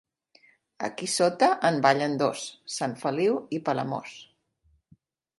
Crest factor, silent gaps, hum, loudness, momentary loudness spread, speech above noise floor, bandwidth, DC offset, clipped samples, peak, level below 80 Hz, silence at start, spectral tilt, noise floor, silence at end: 22 dB; none; none; -26 LUFS; 13 LU; 42 dB; 11.5 kHz; under 0.1%; under 0.1%; -6 dBFS; -74 dBFS; 0.8 s; -4 dB/octave; -68 dBFS; 1.15 s